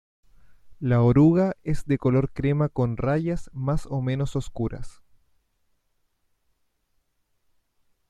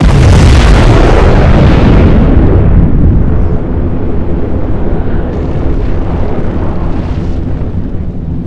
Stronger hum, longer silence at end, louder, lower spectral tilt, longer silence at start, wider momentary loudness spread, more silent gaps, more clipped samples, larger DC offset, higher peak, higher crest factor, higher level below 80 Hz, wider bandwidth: neither; first, 3.2 s vs 0 s; second, -24 LUFS vs -10 LUFS; first, -9 dB/octave vs -7.5 dB/octave; first, 0.5 s vs 0 s; first, 13 LU vs 10 LU; neither; second, under 0.1% vs 6%; neither; second, -8 dBFS vs 0 dBFS; first, 18 dB vs 6 dB; second, -42 dBFS vs -10 dBFS; about the same, 10.5 kHz vs 11 kHz